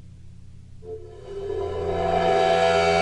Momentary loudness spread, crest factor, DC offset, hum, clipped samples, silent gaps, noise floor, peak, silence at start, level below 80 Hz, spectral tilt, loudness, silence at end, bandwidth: 20 LU; 14 dB; under 0.1%; none; under 0.1%; none; -42 dBFS; -8 dBFS; 0 s; -46 dBFS; -5 dB/octave; -22 LUFS; 0 s; 11 kHz